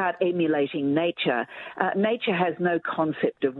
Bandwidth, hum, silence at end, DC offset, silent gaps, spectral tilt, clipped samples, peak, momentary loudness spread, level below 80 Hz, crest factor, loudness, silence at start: 4.3 kHz; none; 0 s; under 0.1%; none; -9 dB/octave; under 0.1%; -6 dBFS; 3 LU; -72 dBFS; 20 dB; -25 LUFS; 0 s